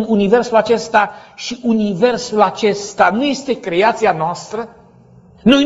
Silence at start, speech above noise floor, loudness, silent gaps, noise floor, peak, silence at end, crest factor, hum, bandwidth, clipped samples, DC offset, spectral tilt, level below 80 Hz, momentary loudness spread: 0 s; 29 dB; -15 LUFS; none; -45 dBFS; 0 dBFS; 0 s; 16 dB; none; 8 kHz; under 0.1%; under 0.1%; -5 dB/octave; -50 dBFS; 12 LU